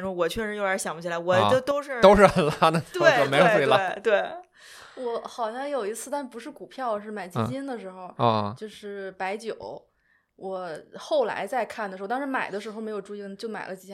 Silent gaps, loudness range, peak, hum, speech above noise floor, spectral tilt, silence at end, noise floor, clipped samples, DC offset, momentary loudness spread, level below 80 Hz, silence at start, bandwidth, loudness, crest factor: none; 11 LU; -2 dBFS; none; 41 dB; -5 dB/octave; 0 s; -67 dBFS; under 0.1%; under 0.1%; 18 LU; -52 dBFS; 0 s; 15 kHz; -25 LUFS; 22 dB